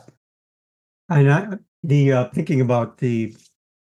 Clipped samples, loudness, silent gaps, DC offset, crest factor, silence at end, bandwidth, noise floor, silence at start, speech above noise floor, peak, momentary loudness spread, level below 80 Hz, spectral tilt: under 0.1%; -19 LUFS; 1.68-1.83 s; under 0.1%; 16 dB; 0.6 s; 7.4 kHz; under -90 dBFS; 1.1 s; over 71 dB; -4 dBFS; 13 LU; -66 dBFS; -8.5 dB/octave